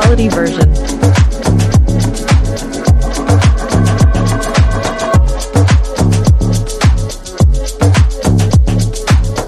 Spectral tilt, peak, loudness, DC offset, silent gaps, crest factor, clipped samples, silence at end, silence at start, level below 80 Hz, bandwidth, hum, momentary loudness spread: -6 dB/octave; 0 dBFS; -12 LUFS; under 0.1%; none; 10 dB; under 0.1%; 0 s; 0 s; -14 dBFS; 13 kHz; none; 4 LU